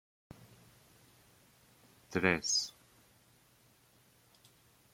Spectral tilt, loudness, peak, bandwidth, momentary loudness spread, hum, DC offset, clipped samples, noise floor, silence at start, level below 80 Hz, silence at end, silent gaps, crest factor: -2.5 dB/octave; -33 LUFS; -12 dBFS; 16.5 kHz; 27 LU; none; under 0.1%; under 0.1%; -67 dBFS; 2.1 s; -72 dBFS; 2.25 s; none; 30 dB